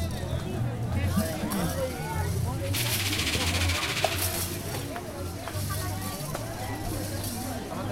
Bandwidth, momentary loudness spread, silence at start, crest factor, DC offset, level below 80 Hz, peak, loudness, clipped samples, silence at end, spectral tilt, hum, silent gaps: 16.5 kHz; 8 LU; 0 s; 22 dB; under 0.1%; -42 dBFS; -8 dBFS; -29 LUFS; under 0.1%; 0 s; -4 dB/octave; none; none